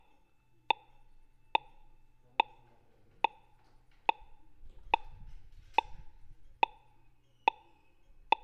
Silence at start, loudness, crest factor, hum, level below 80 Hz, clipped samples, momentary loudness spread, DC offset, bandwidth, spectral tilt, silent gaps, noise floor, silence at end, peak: 2.4 s; -35 LUFS; 30 dB; none; -56 dBFS; under 0.1%; 3 LU; under 0.1%; 6.6 kHz; -3.5 dB/octave; none; -68 dBFS; 1.75 s; -8 dBFS